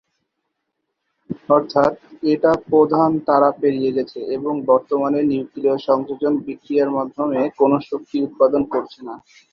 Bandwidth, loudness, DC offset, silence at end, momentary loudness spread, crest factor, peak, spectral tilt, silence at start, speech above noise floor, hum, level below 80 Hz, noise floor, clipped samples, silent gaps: 6.8 kHz; -19 LUFS; under 0.1%; 0.35 s; 9 LU; 18 dB; -2 dBFS; -8.5 dB/octave; 1.3 s; 58 dB; none; -58 dBFS; -76 dBFS; under 0.1%; none